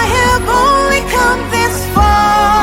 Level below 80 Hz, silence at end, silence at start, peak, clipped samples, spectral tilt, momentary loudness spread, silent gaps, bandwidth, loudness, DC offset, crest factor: -22 dBFS; 0 s; 0 s; 0 dBFS; under 0.1%; -4 dB/octave; 4 LU; none; 17 kHz; -11 LUFS; under 0.1%; 10 dB